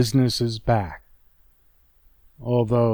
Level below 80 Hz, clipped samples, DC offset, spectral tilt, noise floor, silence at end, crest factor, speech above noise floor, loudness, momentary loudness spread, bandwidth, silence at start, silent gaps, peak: -46 dBFS; under 0.1%; under 0.1%; -6.5 dB/octave; -59 dBFS; 0 s; 16 dB; 38 dB; -23 LUFS; 16 LU; over 20 kHz; 0 s; none; -8 dBFS